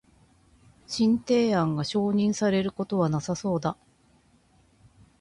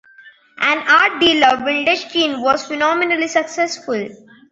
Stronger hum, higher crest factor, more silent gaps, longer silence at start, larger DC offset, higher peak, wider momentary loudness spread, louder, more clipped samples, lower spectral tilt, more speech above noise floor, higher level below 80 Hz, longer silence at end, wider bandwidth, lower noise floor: neither; about the same, 16 dB vs 16 dB; neither; first, 0.9 s vs 0.25 s; neither; second, -12 dBFS vs -2 dBFS; second, 7 LU vs 10 LU; second, -26 LUFS vs -15 LUFS; neither; first, -6 dB/octave vs -2 dB/octave; first, 37 dB vs 29 dB; about the same, -60 dBFS vs -58 dBFS; first, 1.45 s vs 0.35 s; first, 11 kHz vs 8 kHz; first, -62 dBFS vs -46 dBFS